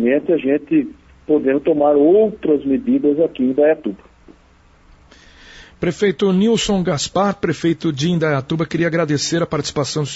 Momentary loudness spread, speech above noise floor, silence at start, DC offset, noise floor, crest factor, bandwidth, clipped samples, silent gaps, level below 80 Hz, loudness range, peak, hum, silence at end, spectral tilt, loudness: 6 LU; 34 dB; 0 s; under 0.1%; -50 dBFS; 14 dB; 8 kHz; under 0.1%; none; -48 dBFS; 5 LU; -4 dBFS; none; 0 s; -5.5 dB/octave; -17 LUFS